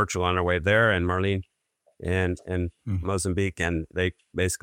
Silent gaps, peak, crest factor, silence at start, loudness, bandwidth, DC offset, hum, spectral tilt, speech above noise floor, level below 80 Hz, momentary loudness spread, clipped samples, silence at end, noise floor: none; -8 dBFS; 18 dB; 0 s; -26 LUFS; 16 kHz; under 0.1%; none; -5 dB/octave; 32 dB; -48 dBFS; 10 LU; under 0.1%; 0.05 s; -58 dBFS